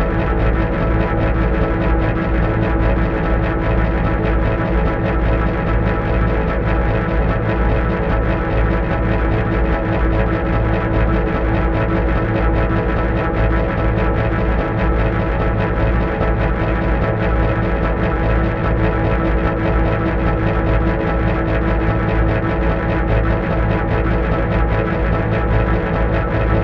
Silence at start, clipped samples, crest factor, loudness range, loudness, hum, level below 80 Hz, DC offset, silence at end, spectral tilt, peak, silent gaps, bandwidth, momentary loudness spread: 0 s; under 0.1%; 14 dB; 0 LU; -18 LUFS; none; -20 dBFS; 0.1%; 0 s; -9.5 dB/octave; -2 dBFS; none; 5.2 kHz; 1 LU